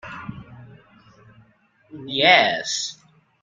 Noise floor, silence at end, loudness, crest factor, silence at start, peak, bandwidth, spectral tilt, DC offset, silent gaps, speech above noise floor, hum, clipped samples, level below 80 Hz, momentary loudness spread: -59 dBFS; 0.5 s; -18 LUFS; 24 dB; 0.05 s; -2 dBFS; 9.6 kHz; -2 dB/octave; under 0.1%; none; 39 dB; none; under 0.1%; -60 dBFS; 25 LU